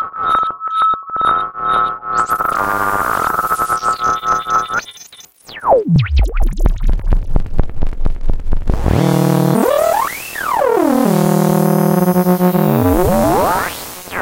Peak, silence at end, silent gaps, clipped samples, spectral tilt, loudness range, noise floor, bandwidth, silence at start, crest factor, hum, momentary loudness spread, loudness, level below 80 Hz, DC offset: 0 dBFS; 0 s; none; under 0.1%; -6.5 dB/octave; 5 LU; -40 dBFS; 17 kHz; 0 s; 14 dB; none; 9 LU; -15 LUFS; -20 dBFS; under 0.1%